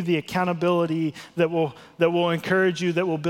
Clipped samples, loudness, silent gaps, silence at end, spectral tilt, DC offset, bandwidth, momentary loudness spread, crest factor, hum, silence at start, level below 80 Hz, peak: under 0.1%; -23 LUFS; none; 0 s; -6.5 dB/octave; under 0.1%; 16 kHz; 5 LU; 16 dB; none; 0 s; -64 dBFS; -8 dBFS